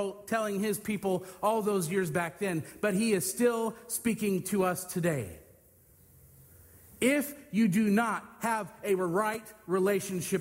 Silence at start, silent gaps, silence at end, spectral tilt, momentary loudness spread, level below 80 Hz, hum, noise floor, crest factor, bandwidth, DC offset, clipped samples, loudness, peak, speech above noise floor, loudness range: 0 s; none; 0 s; -5 dB/octave; 6 LU; -66 dBFS; none; -60 dBFS; 16 dB; 16 kHz; under 0.1%; under 0.1%; -30 LUFS; -14 dBFS; 31 dB; 3 LU